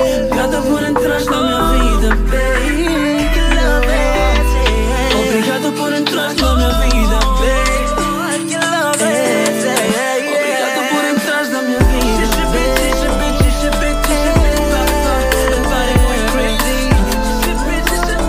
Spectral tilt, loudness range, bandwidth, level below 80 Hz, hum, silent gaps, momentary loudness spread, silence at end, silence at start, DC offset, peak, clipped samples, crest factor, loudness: -4.5 dB/octave; 1 LU; 16 kHz; -18 dBFS; none; none; 2 LU; 0 s; 0 s; under 0.1%; -2 dBFS; under 0.1%; 12 dB; -14 LUFS